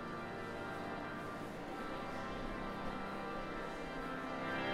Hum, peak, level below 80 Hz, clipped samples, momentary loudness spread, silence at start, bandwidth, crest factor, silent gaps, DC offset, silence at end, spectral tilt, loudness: none; -26 dBFS; -56 dBFS; under 0.1%; 3 LU; 0 s; 16 kHz; 16 dB; none; under 0.1%; 0 s; -5.5 dB/octave; -43 LUFS